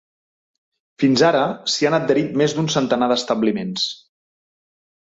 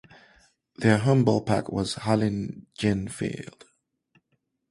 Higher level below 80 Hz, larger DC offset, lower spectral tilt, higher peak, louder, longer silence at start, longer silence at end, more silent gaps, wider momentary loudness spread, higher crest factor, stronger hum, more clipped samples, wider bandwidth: second, -60 dBFS vs -54 dBFS; neither; second, -4.5 dB/octave vs -6.5 dB/octave; about the same, -4 dBFS vs -4 dBFS; first, -19 LUFS vs -25 LUFS; first, 1 s vs 0.8 s; second, 1.1 s vs 1.25 s; neither; second, 7 LU vs 12 LU; about the same, 18 dB vs 22 dB; neither; neither; second, 8 kHz vs 11.5 kHz